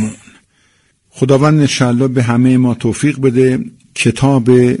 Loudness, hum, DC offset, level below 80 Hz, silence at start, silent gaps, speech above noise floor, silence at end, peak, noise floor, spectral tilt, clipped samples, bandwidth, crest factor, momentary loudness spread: -12 LUFS; none; under 0.1%; -46 dBFS; 0 s; none; 45 dB; 0 s; 0 dBFS; -56 dBFS; -6.5 dB/octave; under 0.1%; 11.5 kHz; 12 dB; 7 LU